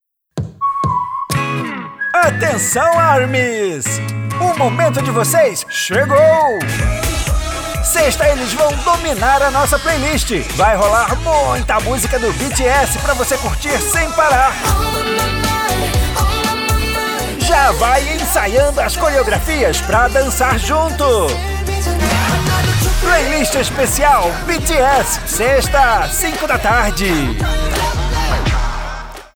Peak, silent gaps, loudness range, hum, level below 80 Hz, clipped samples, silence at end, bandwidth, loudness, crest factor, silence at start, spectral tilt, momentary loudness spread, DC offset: 0 dBFS; none; 1 LU; none; -22 dBFS; under 0.1%; 0.1 s; over 20 kHz; -14 LUFS; 14 dB; 0.35 s; -3.5 dB/octave; 7 LU; under 0.1%